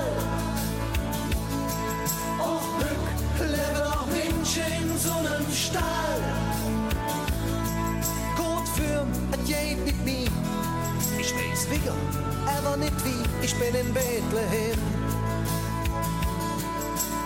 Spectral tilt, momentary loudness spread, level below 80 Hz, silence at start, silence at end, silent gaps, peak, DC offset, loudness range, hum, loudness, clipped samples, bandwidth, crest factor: -4.5 dB/octave; 3 LU; -36 dBFS; 0 s; 0 s; none; -14 dBFS; under 0.1%; 1 LU; none; -27 LUFS; under 0.1%; 17 kHz; 14 dB